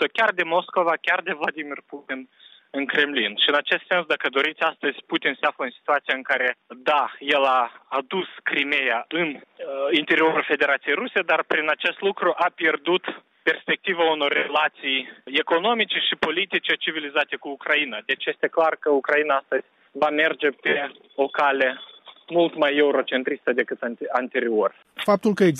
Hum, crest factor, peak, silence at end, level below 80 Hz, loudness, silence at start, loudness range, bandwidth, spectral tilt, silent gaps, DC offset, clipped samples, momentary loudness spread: none; 16 dB; -6 dBFS; 0 s; -74 dBFS; -22 LUFS; 0 s; 2 LU; 12.5 kHz; -5 dB/octave; none; under 0.1%; under 0.1%; 8 LU